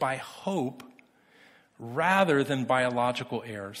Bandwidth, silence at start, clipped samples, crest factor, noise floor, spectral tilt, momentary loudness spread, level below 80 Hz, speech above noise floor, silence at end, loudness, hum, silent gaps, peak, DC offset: 15.5 kHz; 0 s; under 0.1%; 20 dB; -59 dBFS; -5.5 dB/octave; 13 LU; -68 dBFS; 31 dB; 0 s; -28 LUFS; none; none; -10 dBFS; under 0.1%